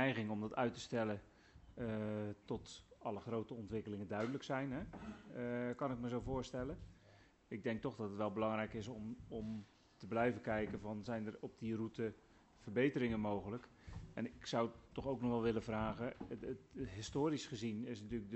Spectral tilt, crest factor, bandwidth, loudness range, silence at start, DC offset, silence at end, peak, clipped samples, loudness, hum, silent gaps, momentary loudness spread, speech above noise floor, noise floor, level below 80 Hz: -6.5 dB/octave; 20 dB; 8.2 kHz; 3 LU; 0 s; under 0.1%; 0 s; -22 dBFS; under 0.1%; -43 LUFS; none; none; 11 LU; 25 dB; -67 dBFS; -62 dBFS